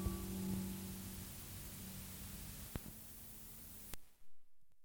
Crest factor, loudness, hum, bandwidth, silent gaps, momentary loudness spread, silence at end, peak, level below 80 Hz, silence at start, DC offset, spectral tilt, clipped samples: 26 dB; -48 LUFS; none; over 20 kHz; none; 8 LU; 0 s; -22 dBFS; -56 dBFS; 0 s; under 0.1%; -4.5 dB/octave; under 0.1%